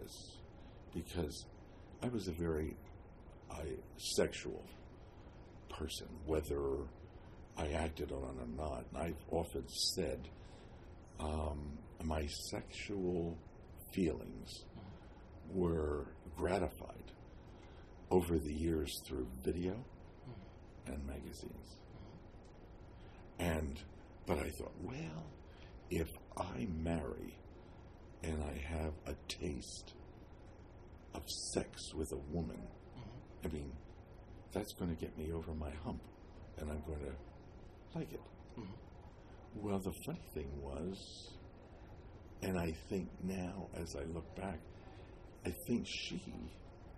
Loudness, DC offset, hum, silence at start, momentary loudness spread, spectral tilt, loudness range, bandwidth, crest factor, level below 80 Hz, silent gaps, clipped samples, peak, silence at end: -43 LUFS; under 0.1%; none; 0 s; 19 LU; -5.5 dB/octave; 6 LU; 13 kHz; 24 dB; -52 dBFS; none; under 0.1%; -20 dBFS; 0 s